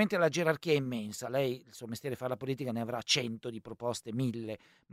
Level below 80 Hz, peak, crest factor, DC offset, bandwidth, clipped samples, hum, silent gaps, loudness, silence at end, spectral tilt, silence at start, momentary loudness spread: -72 dBFS; -14 dBFS; 20 dB; under 0.1%; 16 kHz; under 0.1%; none; none; -34 LUFS; 0.35 s; -4.5 dB/octave; 0 s; 13 LU